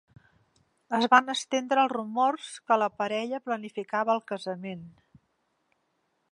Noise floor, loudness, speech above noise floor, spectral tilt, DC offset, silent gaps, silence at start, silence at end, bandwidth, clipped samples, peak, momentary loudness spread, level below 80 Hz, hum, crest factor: -75 dBFS; -27 LUFS; 48 dB; -3.5 dB/octave; under 0.1%; none; 0.9 s; 1.45 s; 11.5 kHz; under 0.1%; -6 dBFS; 14 LU; -78 dBFS; none; 24 dB